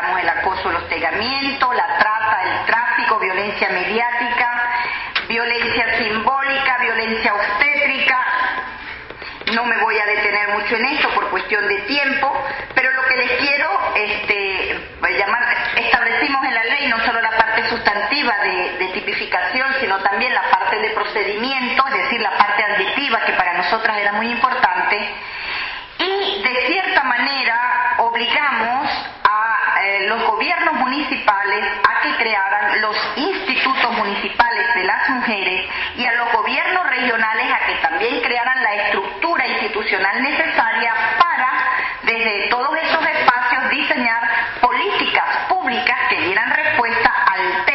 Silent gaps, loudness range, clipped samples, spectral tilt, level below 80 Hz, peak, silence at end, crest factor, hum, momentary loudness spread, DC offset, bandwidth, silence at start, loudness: none; 2 LU; under 0.1%; 1 dB/octave; -50 dBFS; 0 dBFS; 0 s; 18 dB; none; 4 LU; under 0.1%; 6 kHz; 0 s; -17 LUFS